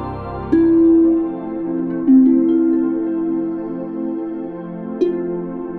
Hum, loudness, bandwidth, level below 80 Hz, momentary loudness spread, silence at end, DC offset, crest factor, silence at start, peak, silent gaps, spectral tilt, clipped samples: none; -17 LUFS; 4.2 kHz; -44 dBFS; 15 LU; 0 s; under 0.1%; 14 dB; 0 s; -4 dBFS; none; -11 dB/octave; under 0.1%